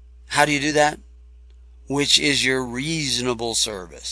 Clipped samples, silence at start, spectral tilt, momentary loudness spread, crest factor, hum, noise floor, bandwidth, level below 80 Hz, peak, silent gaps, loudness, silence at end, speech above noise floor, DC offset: under 0.1%; 0 s; -2.5 dB/octave; 9 LU; 22 dB; none; -46 dBFS; 11 kHz; -46 dBFS; 0 dBFS; none; -20 LUFS; 0 s; 25 dB; under 0.1%